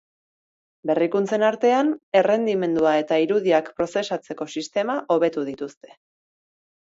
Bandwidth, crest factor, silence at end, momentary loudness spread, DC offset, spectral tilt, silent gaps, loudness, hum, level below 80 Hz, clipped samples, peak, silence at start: 8 kHz; 18 dB; 1.15 s; 10 LU; under 0.1%; -5.5 dB/octave; 2.03-2.12 s; -22 LUFS; none; -66 dBFS; under 0.1%; -6 dBFS; 0.85 s